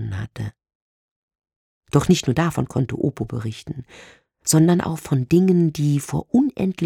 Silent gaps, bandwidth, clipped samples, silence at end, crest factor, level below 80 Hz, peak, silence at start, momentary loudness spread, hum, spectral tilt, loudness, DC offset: 0.75-1.28 s, 1.56-1.81 s; 16.5 kHz; under 0.1%; 0 s; 18 dB; -48 dBFS; -4 dBFS; 0 s; 15 LU; none; -6 dB/octave; -20 LUFS; under 0.1%